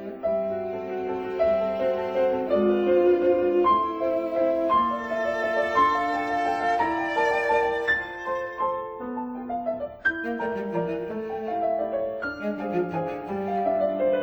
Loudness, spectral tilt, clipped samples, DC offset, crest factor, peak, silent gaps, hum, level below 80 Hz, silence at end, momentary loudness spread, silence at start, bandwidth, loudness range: -25 LUFS; -6.5 dB/octave; under 0.1%; under 0.1%; 16 dB; -10 dBFS; none; none; -56 dBFS; 0 s; 9 LU; 0 s; over 20 kHz; 6 LU